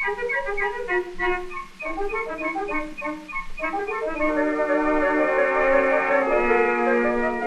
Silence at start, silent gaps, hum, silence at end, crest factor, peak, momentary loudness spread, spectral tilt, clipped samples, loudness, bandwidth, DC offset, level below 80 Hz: 0 s; none; none; 0 s; 16 dB; -6 dBFS; 10 LU; -5.5 dB/octave; under 0.1%; -23 LUFS; 11.5 kHz; under 0.1%; -40 dBFS